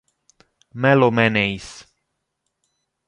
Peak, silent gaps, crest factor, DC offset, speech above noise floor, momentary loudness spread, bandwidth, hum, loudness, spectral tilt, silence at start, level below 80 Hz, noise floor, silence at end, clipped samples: -2 dBFS; none; 20 dB; under 0.1%; 58 dB; 22 LU; 11 kHz; none; -17 LUFS; -6.5 dB/octave; 0.75 s; -54 dBFS; -76 dBFS; 1.25 s; under 0.1%